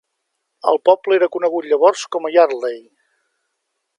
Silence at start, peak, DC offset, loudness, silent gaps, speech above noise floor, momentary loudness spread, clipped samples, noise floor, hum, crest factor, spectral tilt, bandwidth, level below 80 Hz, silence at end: 0.65 s; 0 dBFS; under 0.1%; -16 LUFS; none; 59 dB; 9 LU; under 0.1%; -74 dBFS; none; 18 dB; -3 dB/octave; 11 kHz; -80 dBFS; 1.2 s